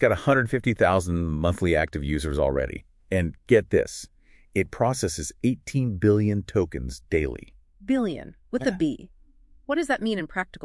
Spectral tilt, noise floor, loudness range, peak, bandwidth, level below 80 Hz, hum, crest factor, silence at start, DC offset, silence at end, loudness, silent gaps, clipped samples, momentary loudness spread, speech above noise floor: -6 dB/octave; -54 dBFS; 4 LU; -4 dBFS; 12 kHz; -42 dBFS; none; 20 dB; 0 s; under 0.1%; 0 s; -25 LUFS; none; under 0.1%; 11 LU; 30 dB